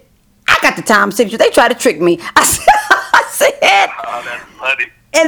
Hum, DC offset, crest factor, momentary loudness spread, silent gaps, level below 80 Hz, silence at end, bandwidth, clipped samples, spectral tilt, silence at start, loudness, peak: none; under 0.1%; 12 dB; 10 LU; none; -44 dBFS; 0 s; over 20 kHz; 0.5%; -2 dB/octave; 0.5 s; -11 LUFS; 0 dBFS